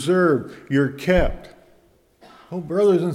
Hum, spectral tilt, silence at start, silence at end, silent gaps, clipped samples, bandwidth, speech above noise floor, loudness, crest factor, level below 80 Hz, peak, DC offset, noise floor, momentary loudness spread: none; -7 dB/octave; 0 s; 0 s; none; under 0.1%; 14 kHz; 38 dB; -20 LUFS; 18 dB; -34 dBFS; -4 dBFS; under 0.1%; -57 dBFS; 15 LU